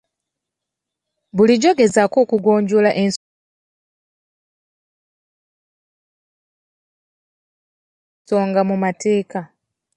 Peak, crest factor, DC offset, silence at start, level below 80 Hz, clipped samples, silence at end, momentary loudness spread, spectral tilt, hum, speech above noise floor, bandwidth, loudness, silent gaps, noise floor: -2 dBFS; 18 dB; under 0.1%; 1.35 s; -64 dBFS; under 0.1%; 0.5 s; 11 LU; -5.5 dB/octave; none; 67 dB; 10.5 kHz; -16 LUFS; 3.16-8.25 s; -83 dBFS